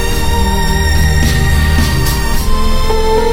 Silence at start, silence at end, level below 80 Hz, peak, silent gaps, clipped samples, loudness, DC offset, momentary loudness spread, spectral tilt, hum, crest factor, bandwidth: 0 s; 0 s; -12 dBFS; 0 dBFS; none; under 0.1%; -13 LUFS; under 0.1%; 4 LU; -5 dB/octave; none; 10 dB; 16.5 kHz